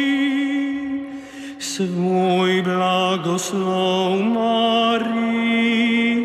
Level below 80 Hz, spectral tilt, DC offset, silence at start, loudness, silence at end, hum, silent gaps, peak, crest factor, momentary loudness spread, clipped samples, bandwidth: -60 dBFS; -5 dB/octave; under 0.1%; 0 s; -19 LUFS; 0 s; none; none; -6 dBFS; 12 dB; 10 LU; under 0.1%; 14 kHz